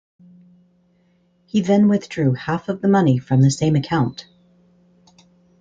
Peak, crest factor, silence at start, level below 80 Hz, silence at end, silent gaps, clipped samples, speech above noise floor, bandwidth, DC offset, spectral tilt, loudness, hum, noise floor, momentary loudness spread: -4 dBFS; 16 dB; 1.55 s; -56 dBFS; 1.4 s; none; under 0.1%; 43 dB; 9 kHz; under 0.1%; -7 dB/octave; -18 LUFS; none; -60 dBFS; 8 LU